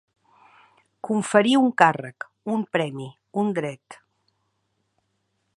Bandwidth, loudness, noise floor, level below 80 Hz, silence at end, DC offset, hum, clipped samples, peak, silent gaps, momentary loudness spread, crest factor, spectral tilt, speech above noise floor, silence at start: 11.5 kHz; -22 LUFS; -73 dBFS; -74 dBFS; 1.6 s; under 0.1%; none; under 0.1%; 0 dBFS; none; 19 LU; 26 dB; -5 dB/octave; 51 dB; 1.05 s